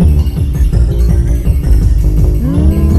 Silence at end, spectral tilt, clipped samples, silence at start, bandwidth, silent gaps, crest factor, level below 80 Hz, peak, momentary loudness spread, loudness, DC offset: 0 s; -8.5 dB/octave; under 0.1%; 0 s; 13.5 kHz; none; 8 dB; -10 dBFS; 0 dBFS; 2 LU; -12 LUFS; under 0.1%